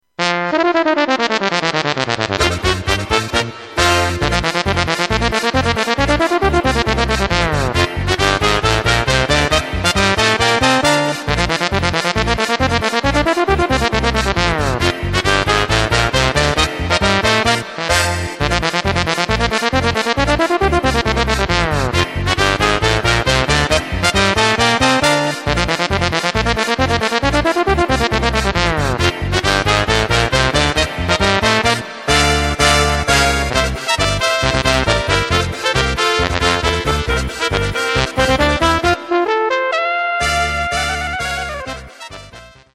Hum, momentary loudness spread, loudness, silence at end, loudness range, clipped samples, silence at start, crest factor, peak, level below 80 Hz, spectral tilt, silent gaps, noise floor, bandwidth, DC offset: none; 4 LU; -15 LUFS; 0.25 s; 2 LU; under 0.1%; 0.2 s; 16 dB; 0 dBFS; -26 dBFS; -4 dB/octave; none; -39 dBFS; 15.5 kHz; under 0.1%